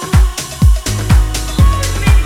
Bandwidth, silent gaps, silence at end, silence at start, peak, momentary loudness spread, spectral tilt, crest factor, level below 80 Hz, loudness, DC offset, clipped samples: 16 kHz; none; 0 s; 0 s; 0 dBFS; 4 LU; -5 dB/octave; 10 dB; -12 dBFS; -13 LUFS; under 0.1%; under 0.1%